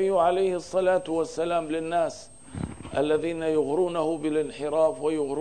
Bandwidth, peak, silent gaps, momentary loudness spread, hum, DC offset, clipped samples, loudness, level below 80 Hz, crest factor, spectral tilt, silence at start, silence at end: 10 kHz; -12 dBFS; none; 8 LU; none; 0.3%; under 0.1%; -26 LUFS; -56 dBFS; 14 dB; -5.5 dB/octave; 0 s; 0 s